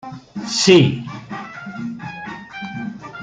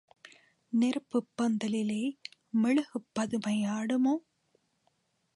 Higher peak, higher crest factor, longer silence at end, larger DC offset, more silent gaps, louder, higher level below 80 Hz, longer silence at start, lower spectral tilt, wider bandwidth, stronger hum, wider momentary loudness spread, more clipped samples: first, 0 dBFS vs -18 dBFS; first, 20 dB vs 14 dB; second, 0 s vs 1.15 s; neither; neither; first, -17 LUFS vs -31 LUFS; first, -58 dBFS vs -78 dBFS; second, 0.05 s vs 0.7 s; about the same, -4.5 dB/octave vs -5.5 dB/octave; second, 9.4 kHz vs 11.5 kHz; neither; first, 20 LU vs 7 LU; neither